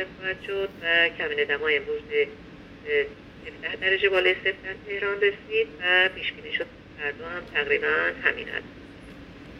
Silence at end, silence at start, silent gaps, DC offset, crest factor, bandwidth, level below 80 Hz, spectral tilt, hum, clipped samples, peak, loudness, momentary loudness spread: 0 s; 0 s; none; under 0.1%; 20 dB; 6.8 kHz; -56 dBFS; -5 dB/octave; none; under 0.1%; -6 dBFS; -25 LUFS; 21 LU